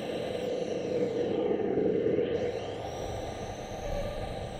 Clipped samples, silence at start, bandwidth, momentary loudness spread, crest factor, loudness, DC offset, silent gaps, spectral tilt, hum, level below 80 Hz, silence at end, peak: under 0.1%; 0 s; 15.5 kHz; 9 LU; 14 dB; -32 LUFS; under 0.1%; none; -6 dB/octave; none; -46 dBFS; 0 s; -16 dBFS